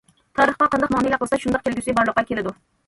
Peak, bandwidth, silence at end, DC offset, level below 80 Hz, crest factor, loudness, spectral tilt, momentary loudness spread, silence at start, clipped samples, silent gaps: -4 dBFS; 11.5 kHz; 0.35 s; under 0.1%; -48 dBFS; 16 dB; -21 LUFS; -5 dB/octave; 9 LU; 0.35 s; under 0.1%; none